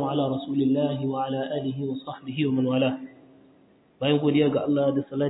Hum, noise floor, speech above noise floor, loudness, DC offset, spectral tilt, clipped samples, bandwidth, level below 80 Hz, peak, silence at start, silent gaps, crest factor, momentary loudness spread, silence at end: none; -58 dBFS; 33 dB; -25 LUFS; under 0.1%; -11 dB/octave; under 0.1%; 4 kHz; -66 dBFS; -10 dBFS; 0 s; none; 16 dB; 10 LU; 0 s